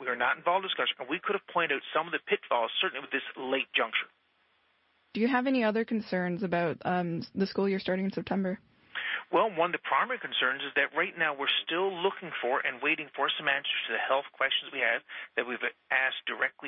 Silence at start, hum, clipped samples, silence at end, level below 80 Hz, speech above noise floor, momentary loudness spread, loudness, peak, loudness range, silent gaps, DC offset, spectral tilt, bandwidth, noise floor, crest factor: 0 s; none; under 0.1%; 0 s; -74 dBFS; 40 dB; 6 LU; -30 LUFS; -14 dBFS; 2 LU; none; under 0.1%; -8.5 dB/octave; 5.8 kHz; -70 dBFS; 18 dB